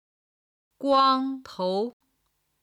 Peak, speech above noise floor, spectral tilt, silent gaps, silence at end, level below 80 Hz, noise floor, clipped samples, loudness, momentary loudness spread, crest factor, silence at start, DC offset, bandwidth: -10 dBFS; 50 dB; -5.5 dB/octave; none; 0.7 s; -72 dBFS; -74 dBFS; under 0.1%; -25 LUFS; 12 LU; 18 dB; 0.8 s; under 0.1%; 11.5 kHz